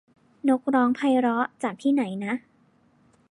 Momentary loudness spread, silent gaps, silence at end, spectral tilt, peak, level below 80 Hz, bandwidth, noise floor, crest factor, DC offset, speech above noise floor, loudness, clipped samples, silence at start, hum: 8 LU; none; 0.95 s; -6 dB/octave; -10 dBFS; -76 dBFS; 11 kHz; -62 dBFS; 16 dB; under 0.1%; 38 dB; -25 LUFS; under 0.1%; 0.45 s; none